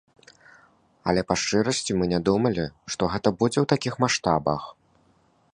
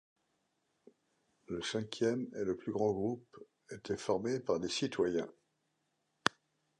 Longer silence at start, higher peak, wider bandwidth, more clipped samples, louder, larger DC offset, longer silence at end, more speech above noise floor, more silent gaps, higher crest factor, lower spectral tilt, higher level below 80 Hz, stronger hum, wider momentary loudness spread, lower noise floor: second, 1.05 s vs 1.5 s; first, -4 dBFS vs -8 dBFS; about the same, 10.5 kHz vs 11 kHz; neither; first, -24 LUFS vs -36 LUFS; neither; second, 0.8 s vs 1.5 s; second, 39 dB vs 45 dB; neither; second, 22 dB vs 30 dB; about the same, -5 dB/octave vs -4.5 dB/octave; first, -50 dBFS vs -70 dBFS; neither; about the same, 8 LU vs 10 LU; second, -63 dBFS vs -81 dBFS